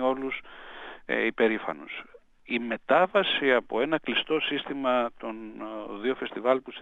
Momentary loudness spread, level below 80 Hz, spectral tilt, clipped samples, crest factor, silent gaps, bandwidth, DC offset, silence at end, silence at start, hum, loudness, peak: 15 LU; -62 dBFS; -6 dB/octave; under 0.1%; 20 dB; none; 7.8 kHz; under 0.1%; 0 s; 0 s; none; -27 LUFS; -8 dBFS